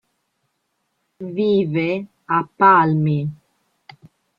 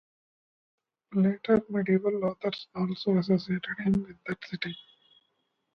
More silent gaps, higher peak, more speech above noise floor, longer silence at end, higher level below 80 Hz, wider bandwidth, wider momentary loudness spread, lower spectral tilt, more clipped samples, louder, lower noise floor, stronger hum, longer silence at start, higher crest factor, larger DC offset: neither; first, -2 dBFS vs -12 dBFS; first, 55 dB vs 49 dB; about the same, 1.05 s vs 0.95 s; about the same, -64 dBFS vs -62 dBFS; second, 5.2 kHz vs 6 kHz; first, 16 LU vs 11 LU; about the same, -9.5 dB/octave vs -8.5 dB/octave; neither; first, -18 LUFS vs -29 LUFS; second, -72 dBFS vs -77 dBFS; neither; about the same, 1.2 s vs 1.1 s; about the same, 18 dB vs 18 dB; neither